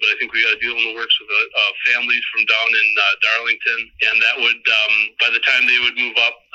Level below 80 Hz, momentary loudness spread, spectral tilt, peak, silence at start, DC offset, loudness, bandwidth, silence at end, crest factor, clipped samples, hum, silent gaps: -62 dBFS; 4 LU; 0.5 dB/octave; -4 dBFS; 0 s; under 0.1%; -15 LUFS; 8.2 kHz; 0.2 s; 14 dB; under 0.1%; none; none